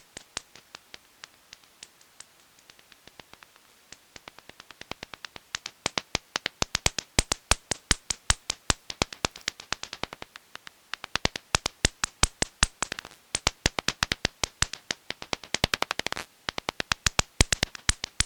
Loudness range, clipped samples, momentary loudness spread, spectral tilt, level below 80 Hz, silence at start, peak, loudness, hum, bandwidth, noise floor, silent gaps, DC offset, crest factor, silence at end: 19 LU; under 0.1%; 23 LU; -1.5 dB/octave; -42 dBFS; 0.35 s; -2 dBFS; -29 LUFS; none; over 20 kHz; -57 dBFS; none; under 0.1%; 30 dB; 0 s